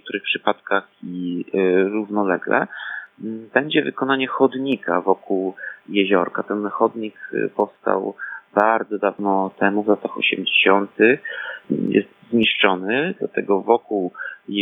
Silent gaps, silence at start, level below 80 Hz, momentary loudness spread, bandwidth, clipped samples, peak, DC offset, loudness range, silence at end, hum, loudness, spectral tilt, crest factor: none; 0.05 s; -72 dBFS; 11 LU; 4 kHz; under 0.1%; 0 dBFS; under 0.1%; 4 LU; 0 s; none; -20 LUFS; -8 dB/octave; 20 dB